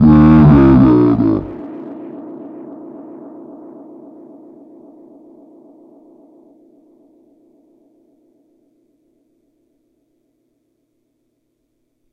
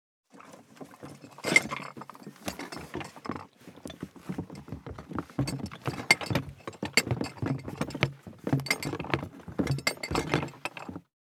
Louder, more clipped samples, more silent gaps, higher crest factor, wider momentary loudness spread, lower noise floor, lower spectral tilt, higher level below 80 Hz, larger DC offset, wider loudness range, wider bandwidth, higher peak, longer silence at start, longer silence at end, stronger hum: first, -9 LUFS vs -31 LUFS; neither; neither; second, 16 dB vs 30 dB; first, 29 LU vs 22 LU; first, -67 dBFS vs -52 dBFS; first, -11.5 dB/octave vs -4 dB/octave; first, -32 dBFS vs -56 dBFS; neither; first, 29 LU vs 10 LU; second, 5.2 kHz vs 17.5 kHz; about the same, 0 dBFS vs -2 dBFS; second, 0 s vs 0.35 s; first, 9.1 s vs 0.4 s; neither